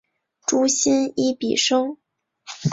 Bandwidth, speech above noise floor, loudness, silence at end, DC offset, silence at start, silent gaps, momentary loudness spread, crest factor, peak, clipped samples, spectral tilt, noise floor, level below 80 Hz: 8 kHz; 24 dB; -20 LUFS; 0 s; under 0.1%; 0.5 s; none; 10 LU; 16 dB; -6 dBFS; under 0.1%; -3.5 dB/octave; -44 dBFS; -64 dBFS